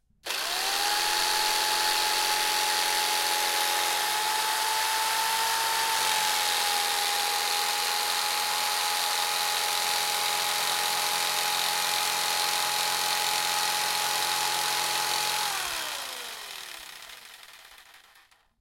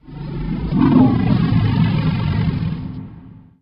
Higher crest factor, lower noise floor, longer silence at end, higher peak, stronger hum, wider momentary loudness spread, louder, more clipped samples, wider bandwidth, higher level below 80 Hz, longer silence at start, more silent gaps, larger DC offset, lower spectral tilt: about the same, 18 dB vs 18 dB; first, -60 dBFS vs -40 dBFS; first, 0.65 s vs 0.25 s; second, -10 dBFS vs 0 dBFS; neither; second, 7 LU vs 16 LU; second, -25 LUFS vs -17 LUFS; neither; first, 17 kHz vs 5.6 kHz; second, -66 dBFS vs -32 dBFS; first, 0.25 s vs 0.05 s; neither; neither; second, 1.5 dB/octave vs -10.5 dB/octave